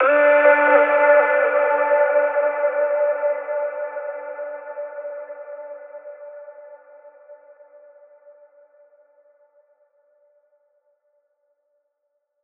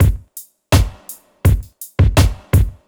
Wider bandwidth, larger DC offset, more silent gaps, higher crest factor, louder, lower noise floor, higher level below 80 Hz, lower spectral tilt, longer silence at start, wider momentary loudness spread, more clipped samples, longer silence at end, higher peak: second, 3.7 kHz vs over 20 kHz; neither; neither; about the same, 20 dB vs 16 dB; about the same, -18 LUFS vs -17 LUFS; first, -75 dBFS vs -39 dBFS; second, -84 dBFS vs -20 dBFS; about the same, -4.5 dB/octave vs -5.5 dB/octave; about the same, 0 s vs 0 s; first, 24 LU vs 21 LU; neither; first, 5.1 s vs 0.15 s; about the same, -2 dBFS vs 0 dBFS